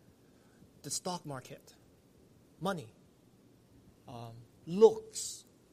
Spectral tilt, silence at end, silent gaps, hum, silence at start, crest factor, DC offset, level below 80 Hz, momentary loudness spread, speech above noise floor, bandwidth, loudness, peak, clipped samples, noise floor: -4.5 dB/octave; 0.3 s; none; none; 0.85 s; 26 dB; under 0.1%; -74 dBFS; 26 LU; 31 dB; 15 kHz; -33 LUFS; -10 dBFS; under 0.1%; -63 dBFS